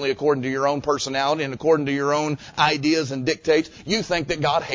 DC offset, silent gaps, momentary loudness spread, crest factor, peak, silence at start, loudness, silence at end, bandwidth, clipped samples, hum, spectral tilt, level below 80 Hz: under 0.1%; none; 4 LU; 18 dB; -4 dBFS; 0 s; -22 LUFS; 0 s; 7.8 kHz; under 0.1%; none; -4.5 dB/octave; -52 dBFS